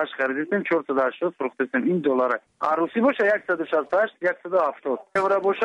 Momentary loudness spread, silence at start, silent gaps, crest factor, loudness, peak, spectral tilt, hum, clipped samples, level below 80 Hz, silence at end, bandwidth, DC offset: 5 LU; 0 s; none; 14 dB; -23 LUFS; -10 dBFS; -7 dB/octave; none; under 0.1%; -72 dBFS; 0 s; 10.5 kHz; under 0.1%